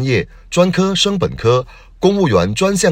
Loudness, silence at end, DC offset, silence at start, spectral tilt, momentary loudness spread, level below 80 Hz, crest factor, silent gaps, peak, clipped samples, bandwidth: -15 LUFS; 0 s; under 0.1%; 0 s; -5 dB/octave; 5 LU; -38 dBFS; 14 dB; none; 0 dBFS; under 0.1%; 16.5 kHz